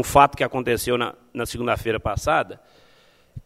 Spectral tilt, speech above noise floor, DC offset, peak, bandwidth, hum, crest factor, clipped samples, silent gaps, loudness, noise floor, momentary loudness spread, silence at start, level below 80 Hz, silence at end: -4.5 dB/octave; 34 dB; under 0.1%; 0 dBFS; 16 kHz; none; 22 dB; under 0.1%; none; -22 LUFS; -56 dBFS; 12 LU; 0 s; -42 dBFS; 0.05 s